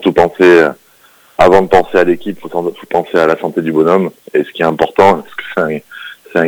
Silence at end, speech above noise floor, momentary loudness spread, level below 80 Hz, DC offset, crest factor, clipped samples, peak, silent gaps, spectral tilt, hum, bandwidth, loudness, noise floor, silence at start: 0 s; 35 dB; 12 LU; -42 dBFS; under 0.1%; 12 dB; 1%; 0 dBFS; none; -6.5 dB/octave; none; over 20 kHz; -12 LUFS; -46 dBFS; 0 s